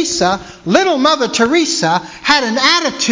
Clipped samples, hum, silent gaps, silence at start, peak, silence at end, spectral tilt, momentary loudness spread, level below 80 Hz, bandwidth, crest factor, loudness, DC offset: under 0.1%; none; none; 0 s; 0 dBFS; 0 s; -2.5 dB/octave; 5 LU; -48 dBFS; 7.8 kHz; 14 dB; -13 LUFS; under 0.1%